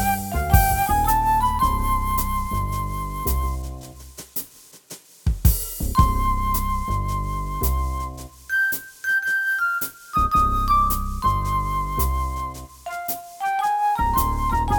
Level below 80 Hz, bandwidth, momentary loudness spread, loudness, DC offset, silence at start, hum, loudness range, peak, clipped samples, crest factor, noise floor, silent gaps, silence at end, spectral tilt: -28 dBFS; over 20 kHz; 11 LU; -22 LUFS; under 0.1%; 0 s; none; 5 LU; -2 dBFS; under 0.1%; 20 dB; -45 dBFS; none; 0 s; -4.5 dB/octave